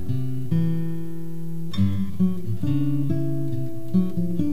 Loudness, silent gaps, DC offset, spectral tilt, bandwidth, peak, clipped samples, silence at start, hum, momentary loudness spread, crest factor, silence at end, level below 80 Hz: -26 LUFS; none; 7%; -9 dB/octave; 15.5 kHz; -8 dBFS; under 0.1%; 0 s; none; 9 LU; 14 dB; 0 s; -54 dBFS